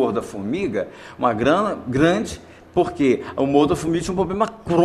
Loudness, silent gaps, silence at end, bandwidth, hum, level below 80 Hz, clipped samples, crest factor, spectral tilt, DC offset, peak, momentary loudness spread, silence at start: -21 LUFS; none; 0 s; 13 kHz; none; -46 dBFS; under 0.1%; 18 dB; -6 dB/octave; under 0.1%; -4 dBFS; 9 LU; 0 s